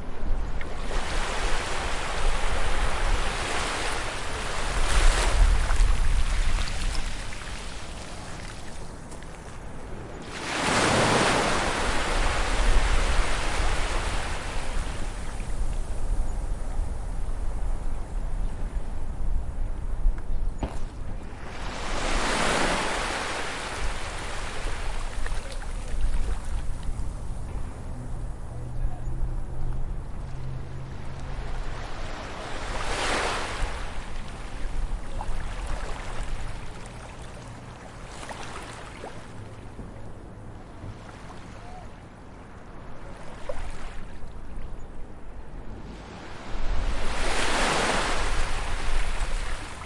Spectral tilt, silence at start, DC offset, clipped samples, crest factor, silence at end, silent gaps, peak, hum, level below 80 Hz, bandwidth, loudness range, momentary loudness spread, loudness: -3.5 dB/octave; 0 s; under 0.1%; under 0.1%; 18 dB; 0 s; none; -8 dBFS; none; -28 dBFS; 11.5 kHz; 15 LU; 17 LU; -30 LUFS